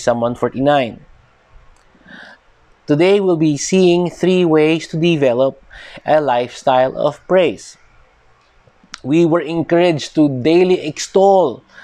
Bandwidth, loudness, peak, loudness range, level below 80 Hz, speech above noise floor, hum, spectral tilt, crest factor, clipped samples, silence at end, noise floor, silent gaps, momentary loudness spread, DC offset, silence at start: 10 kHz; -15 LUFS; -2 dBFS; 4 LU; -52 dBFS; 38 dB; none; -6 dB/octave; 14 dB; under 0.1%; 0.25 s; -52 dBFS; none; 7 LU; under 0.1%; 0 s